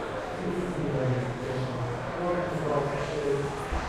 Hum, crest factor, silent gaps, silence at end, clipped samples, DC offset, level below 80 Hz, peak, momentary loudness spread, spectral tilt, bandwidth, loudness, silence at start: none; 14 dB; none; 0 s; under 0.1%; under 0.1%; -44 dBFS; -16 dBFS; 4 LU; -6.5 dB/octave; 13 kHz; -30 LUFS; 0 s